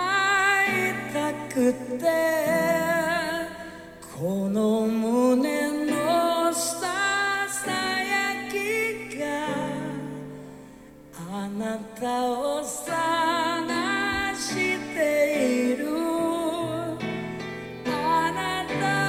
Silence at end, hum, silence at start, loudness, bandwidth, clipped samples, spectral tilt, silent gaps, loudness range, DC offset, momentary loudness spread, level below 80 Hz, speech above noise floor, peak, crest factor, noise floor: 0 s; none; 0 s; -25 LUFS; 17 kHz; under 0.1%; -4 dB/octave; none; 7 LU; under 0.1%; 11 LU; -58 dBFS; 23 dB; -10 dBFS; 14 dB; -47 dBFS